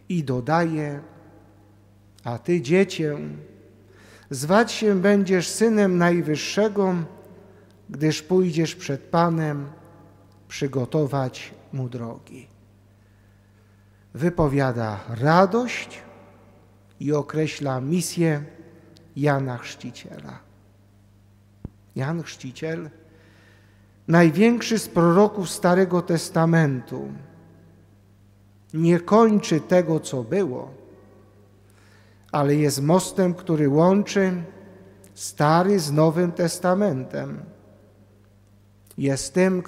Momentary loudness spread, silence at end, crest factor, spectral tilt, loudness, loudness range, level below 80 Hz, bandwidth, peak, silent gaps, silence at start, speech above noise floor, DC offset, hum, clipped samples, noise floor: 19 LU; 0.05 s; 22 dB; -6 dB/octave; -22 LUFS; 9 LU; -56 dBFS; 15.5 kHz; -2 dBFS; none; 0.1 s; 33 dB; under 0.1%; 50 Hz at -50 dBFS; under 0.1%; -54 dBFS